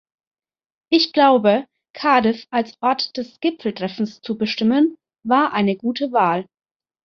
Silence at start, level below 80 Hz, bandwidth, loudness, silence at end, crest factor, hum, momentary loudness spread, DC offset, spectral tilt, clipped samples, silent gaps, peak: 0.9 s; -64 dBFS; 6.6 kHz; -19 LUFS; 0.6 s; 18 dB; none; 11 LU; under 0.1%; -6 dB/octave; under 0.1%; 1.90-1.94 s; -2 dBFS